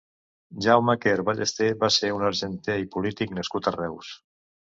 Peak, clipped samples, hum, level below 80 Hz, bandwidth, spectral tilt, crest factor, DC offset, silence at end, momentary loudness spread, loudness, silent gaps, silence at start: -4 dBFS; under 0.1%; none; -58 dBFS; 7.8 kHz; -4 dB/octave; 22 dB; under 0.1%; 0.6 s; 12 LU; -24 LUFS; none; 0.5 s